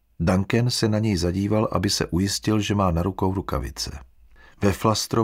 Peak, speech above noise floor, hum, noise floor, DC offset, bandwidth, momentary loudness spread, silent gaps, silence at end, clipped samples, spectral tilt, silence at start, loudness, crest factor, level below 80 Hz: -6 dBFS; 28 dB; none; -50 dBFS; under 0.1%; 16 kHz; 7 LU; none; 0 s; under 0.1%; -5.5 dB/octave; 0.2 s; -23 LUFS; 18 dB; -40 dBFS